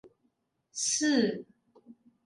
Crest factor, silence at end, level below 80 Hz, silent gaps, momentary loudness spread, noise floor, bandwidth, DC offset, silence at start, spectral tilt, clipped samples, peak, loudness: 18 dB; 0.35 s; -80 dBFS; none; 17 LU; -76 dBFS; 11.5 kHz; under 0.1%; 0.05 s; -2.5 dB/octave; under 0.1%; -14 dBFS; -28 LUFS